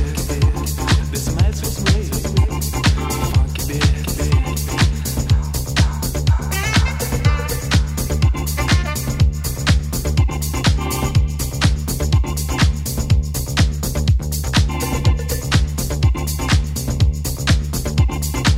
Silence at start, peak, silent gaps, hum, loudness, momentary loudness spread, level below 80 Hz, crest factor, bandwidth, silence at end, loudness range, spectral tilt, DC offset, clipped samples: 0 s; 0 dBFS; none; none; -19 LUFS; 3 LU; -22 dBFS; 18 dB; 16.5 kHz; 0 s; 0 LU; -4.5 dB/octave; under 0.1%; under 0.1%